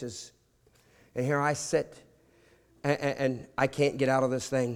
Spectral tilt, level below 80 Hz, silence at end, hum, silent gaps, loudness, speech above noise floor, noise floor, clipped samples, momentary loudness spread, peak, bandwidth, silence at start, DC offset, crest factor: -5 dB/octave; -64 dBFS; 0 s; none; none; -29 LUFS; 36 dB; -65 dBFS; under 0.1%; 14 LU; -10 dBFS; 15.5 kHz; 0 s; under 0.1%; 20 dB